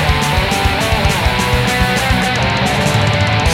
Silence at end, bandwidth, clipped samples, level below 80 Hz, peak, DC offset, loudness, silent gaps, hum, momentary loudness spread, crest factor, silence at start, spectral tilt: 0 s; 16.5 kHz; under 0.1%; -22 dBFS; 0 dBFS; under 0.1%; -14 LUFS; none; none; 1 LU; 14 dB; 0 s; -4.5 dB/octave